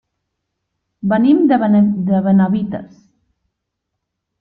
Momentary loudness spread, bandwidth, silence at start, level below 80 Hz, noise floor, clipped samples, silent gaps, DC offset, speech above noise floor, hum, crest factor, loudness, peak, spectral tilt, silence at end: 12 LU; 4.5 kHz; 1.05 s; -56 dBFS; -77 dBFS; under 0.1%; none; under 0.1%; 63 dB; none; 14 dB; -14 LUFS; -2 dBFS; -11 dB/octave; 1.55 s